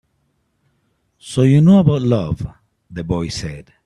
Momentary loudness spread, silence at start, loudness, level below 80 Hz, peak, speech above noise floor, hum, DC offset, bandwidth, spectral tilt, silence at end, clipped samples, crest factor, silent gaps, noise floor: 20 LU; 1.25 s; -16 LUFS; -42 dBFS; 0 dBFS; 51 dB; none; under 0.1%; 11.5 kHz; -7.5 dB/octave; 0.25 s; under 0.1%; 16 dB; none; -66 dBFS